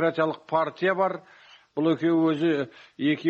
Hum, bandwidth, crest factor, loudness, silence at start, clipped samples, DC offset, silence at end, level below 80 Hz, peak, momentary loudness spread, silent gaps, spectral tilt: none; 6.8 kHz; 14 dB; -25 LUFS; 0 s; under 0.1%; under 0.1%; 0 s; -72 dBFS; -10 dBFS; 10 LU; none; -7.5 dB/octave